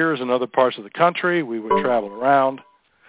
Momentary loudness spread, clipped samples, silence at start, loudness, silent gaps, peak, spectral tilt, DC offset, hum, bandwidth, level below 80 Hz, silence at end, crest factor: 5 LU; under 0.1%; 0 s; -20 LUFS; none; -2 dBFS; -9.5 dB/octave; under 0.1%; none; 4 kHz; -64 dBFS; 0.5 s; 18 dB